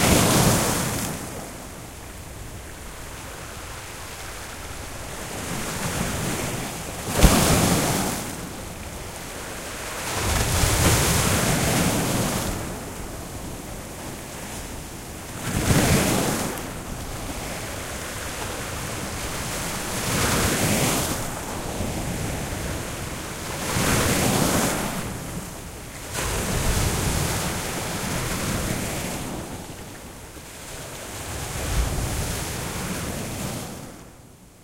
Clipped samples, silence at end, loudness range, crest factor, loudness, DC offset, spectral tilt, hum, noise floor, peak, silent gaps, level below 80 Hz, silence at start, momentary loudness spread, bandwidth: under 0.1%; 0 s; 9 LU; 26 dB; -25 LUFS; under 0.1%; -3.5 dB/octave; none; -47 dBFS; 0 dBFS; none; -34 dBFS; 0 s; 16 LU; 16 kHz